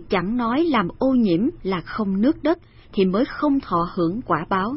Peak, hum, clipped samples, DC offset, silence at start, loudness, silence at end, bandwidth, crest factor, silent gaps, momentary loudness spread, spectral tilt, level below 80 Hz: -6 dBFS; none; under 0.1%; under 0.1%; 0 s; -22 LUFS; 0 s; 5.8 kHz; 14 dB; none; 5 LU; -11.5 dB/octave; -44 dBFS